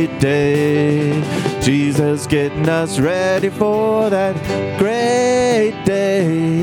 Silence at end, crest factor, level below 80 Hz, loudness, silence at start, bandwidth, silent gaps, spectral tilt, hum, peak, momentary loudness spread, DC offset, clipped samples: 0 s; 14 dB; -44 dBFS; -16 LUFS; 0 s; 18 kHz; none; -6 dB/octave; none; 0 dBFS; 3 LU; under 0.1%; under 0.1%